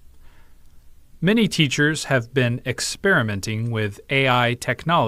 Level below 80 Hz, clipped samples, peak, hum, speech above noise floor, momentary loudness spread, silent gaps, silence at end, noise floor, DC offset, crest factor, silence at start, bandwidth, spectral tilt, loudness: -48 dBFS; under 0.1%; -2 dBFS; none; 24 dB; 7 LU; none; 0 s; -45 dBFS; under 0.1%; 18 dB; 0.15 s; 16 kHz; -4.5 dB/octave; -21 LUFS